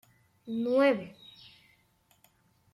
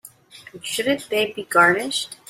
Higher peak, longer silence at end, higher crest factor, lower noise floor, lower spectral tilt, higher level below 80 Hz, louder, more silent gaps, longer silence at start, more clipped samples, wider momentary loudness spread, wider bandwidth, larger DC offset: second, -12 dBFS vs -2 dBFS; first, 1.65 s vs 0.15 s; about the same, 22 dB vs 20 dB; first, -68 dBFS vs -45 dBFS; first, -6.5 dB/octave vs -2.5 dB/octave; second, -76 dBFS vs -66 dBFS; second, -28 LUFS vs -20 LUFS; neither; first, 0.45 s vs 0.05 s; neither; first, 26 LU vs 11 LU; second, 13 kHz vs 16 kHz; neither